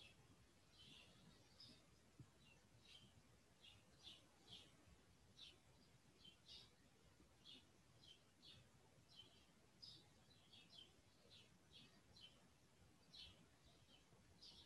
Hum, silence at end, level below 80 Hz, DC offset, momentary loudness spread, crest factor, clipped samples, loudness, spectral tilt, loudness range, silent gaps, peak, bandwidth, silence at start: none; 0 s; -82 dBFS; under 0.1%; 6 LU; 22 dB; under 0.1%; -66 LUFS; -3 dB/octave; 2 LU; none; -48 dBFS; 11.5 kHz; 0 s